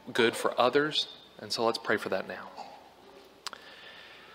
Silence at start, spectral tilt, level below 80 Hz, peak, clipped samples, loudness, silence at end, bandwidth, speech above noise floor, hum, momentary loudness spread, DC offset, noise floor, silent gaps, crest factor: 0.05 s; -3.5 dB/octave; -76 dBFS; -10 dBFS; under 0.1%; -29 LUFS; 0 s; 16 kHz; 25 dB; none; 21 LU; under 0.1%; -54 dBFS; none; 22 dB